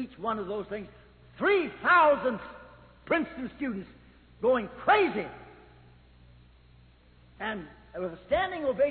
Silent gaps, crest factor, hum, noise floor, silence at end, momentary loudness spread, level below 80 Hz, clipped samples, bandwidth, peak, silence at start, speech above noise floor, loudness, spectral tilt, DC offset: none; 18 dB; none; -58 dBFS; 0 s; 17 LU; -58 dBFS; under 0.1%; 4.5 kHz; -12 dBFS; 0 s; 30 dB; -28 LUFS; -8.5 dB/octave; under 0.1%